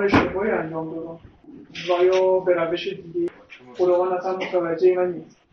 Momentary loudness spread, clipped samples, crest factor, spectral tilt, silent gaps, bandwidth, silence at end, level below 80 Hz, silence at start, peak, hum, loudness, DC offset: 16 LU; under 0.1%; 18 dB; -6.5 dB/octave; none; 6.6 kHz; 0.3 s; -52 dBFS; 0 s; -4 dBFS; none; -22 LUFS; under 0.1%